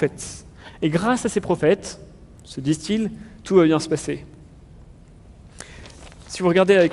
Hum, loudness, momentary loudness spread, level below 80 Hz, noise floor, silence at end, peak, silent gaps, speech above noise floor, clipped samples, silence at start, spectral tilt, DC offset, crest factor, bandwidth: none; -21 LUFS; 24 LU; -48 dBFS; -46 dBFS; 0 s; -4 dBFS; none; 26 dB; under 0.1%; 0 s; -5.5 dB/octave; under 0.1%; 18 dB; 11.5 kHz